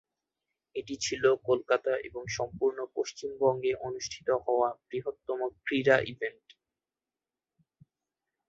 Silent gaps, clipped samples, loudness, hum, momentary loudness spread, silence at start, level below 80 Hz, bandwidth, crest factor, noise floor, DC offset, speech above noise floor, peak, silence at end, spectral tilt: none; under 0.1%; -30 LUFS; none; 11 LU; 0.75 s; -66 dBFS; 8 kHz; 22 dB; under -90 dBFS; under 0.1%; over 60 dB; -10 dBFS; 2.2 s; -4 dB/octave